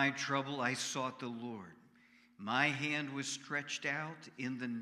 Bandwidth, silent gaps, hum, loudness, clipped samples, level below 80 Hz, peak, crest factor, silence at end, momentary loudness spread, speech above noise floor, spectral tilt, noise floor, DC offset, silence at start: 14.5 kHz; none; none; -37 LUFS; under 0.1%; -86 dBFS; -18 dBFS; 22 dB; 0 s; 13 LU; 28 dB; -3.5 dB/octave; -66 dBFS; under 0.1%; 0 s